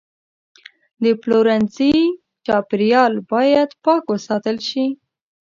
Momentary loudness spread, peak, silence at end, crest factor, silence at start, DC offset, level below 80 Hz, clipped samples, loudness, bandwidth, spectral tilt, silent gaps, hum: 7 LU; 0 dBFS; 0.55 s; 18 dB; 1 s; under 0.1%; -56 dBFS; under 0.1%; -17 LUFS; 7.4 kHz; -6 dB/octave; none; none